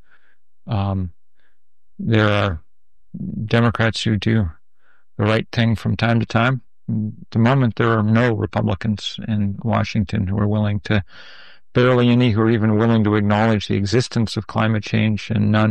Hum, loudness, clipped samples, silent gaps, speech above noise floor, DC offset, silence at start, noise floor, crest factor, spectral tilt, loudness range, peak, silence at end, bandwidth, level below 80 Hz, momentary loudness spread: none; -19 LUFS; under 0.1%; none; 51 dB; 0.7%; 0.65 s; -69 dBFS; 16 dB; -7 dB/octave; 4 LU; -2 dBFS; 0 s; 9 kHz; -46 dBFS; 10 LU